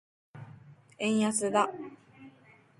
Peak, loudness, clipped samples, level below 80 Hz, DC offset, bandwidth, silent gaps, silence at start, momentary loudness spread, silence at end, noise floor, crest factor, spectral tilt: -12 dBFS; -29 LUFS; under 0.1%; -76 dBFS; under 0.1%; 11.5 kHz; none; 0.35 s; 23 LU; 0.5 s; -60 dBFS; 22 dB; -4 dB/octave